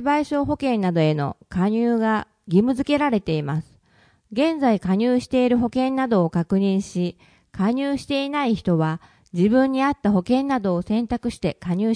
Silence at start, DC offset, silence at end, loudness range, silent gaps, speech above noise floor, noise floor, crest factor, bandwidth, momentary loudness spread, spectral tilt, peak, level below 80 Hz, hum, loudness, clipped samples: 0 s; under 0.1%; 0 s; 2 LU; none; 38 dB; -58 dBFS; 16 dB; 10.5 kHz; 7 LU; -7.5 dB/octave; -6 dBFS; -50 dBFS; none; -22 LUFS; under 0.1%